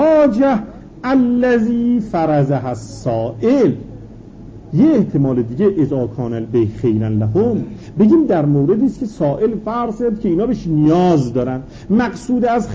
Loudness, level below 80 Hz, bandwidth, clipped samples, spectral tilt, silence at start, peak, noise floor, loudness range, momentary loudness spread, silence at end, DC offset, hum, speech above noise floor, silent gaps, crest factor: -16 LUFS; -42 dBFS; 8 kHz; under 0.1%; -8.5 dB/octave; 0 s; -2 dBFS; -35 dBFS; 2 LU; 9 LU; 0 s; under 0.1%; none; 20 dB; none; 12 dB